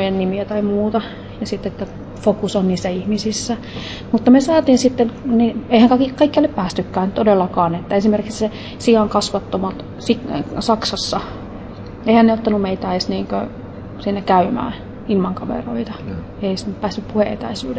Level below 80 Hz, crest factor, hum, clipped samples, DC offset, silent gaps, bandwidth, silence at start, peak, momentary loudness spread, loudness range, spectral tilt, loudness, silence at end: -40 dBFS; 16 dB; none; under 0.1%; under 0.1%; none; 8 kHz; 0 s; -2 dBFS; 14 LU; 6 LU; -6 dB/octave; -18 LUFS; 0 s